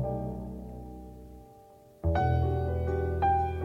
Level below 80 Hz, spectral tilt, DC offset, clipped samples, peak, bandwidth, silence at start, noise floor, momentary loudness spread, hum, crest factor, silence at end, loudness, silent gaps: -38 dBFS; -9 dB/octave; under 0.1%; under 0.1%; -16 dBFS; 5.8 kHz; 0 s; -55 dBFS; 20 LU; none; 14 dB; 0 s; -30 LUFS; none